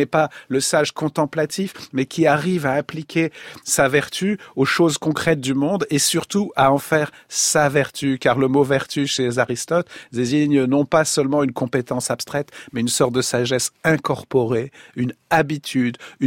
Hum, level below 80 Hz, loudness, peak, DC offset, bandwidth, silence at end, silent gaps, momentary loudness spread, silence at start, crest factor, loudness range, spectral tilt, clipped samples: none; -56 dBFS; -20 LUFS; -2 dBFS; under 0.1%; 16.5 kHz; 0 s; none; 8 LU; 0 s; 18 dB; 2 LU; -4 dB/octave; under 0.1%